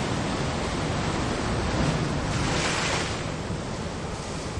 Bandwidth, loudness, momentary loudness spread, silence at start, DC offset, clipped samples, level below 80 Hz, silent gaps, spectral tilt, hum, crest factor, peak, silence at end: 11.5 kHz; -27 LUFS; 7 LU; 0 s; under 0.1%; under 0.1%; -38 dBFS; none; -4.5 dB/octave; none; 14 dB; -12 dBFS; 0 s